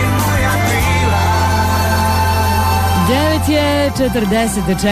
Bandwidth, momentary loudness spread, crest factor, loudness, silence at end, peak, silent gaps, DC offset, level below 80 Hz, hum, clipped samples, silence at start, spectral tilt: 15.5 kHz; 2 LU; 10 dB; -14 LUFS; 0 s; -4 dBFS; none; under 0.1%; -26 dBFS; none; under 0.1%; 0 s; -5 dB/octave